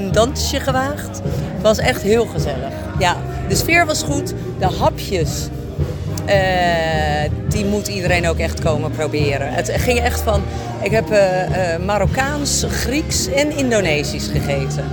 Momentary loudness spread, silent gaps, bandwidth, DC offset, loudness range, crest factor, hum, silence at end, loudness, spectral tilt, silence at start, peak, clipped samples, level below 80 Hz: 8 LU; none; 18 kHz; under 0.1%; 1 LU; 16 dB; none; 0 s; -18 LUFS; -4.5 dB/octave; 0 s; -2 dBFS; under 0.1%; -30 dBFS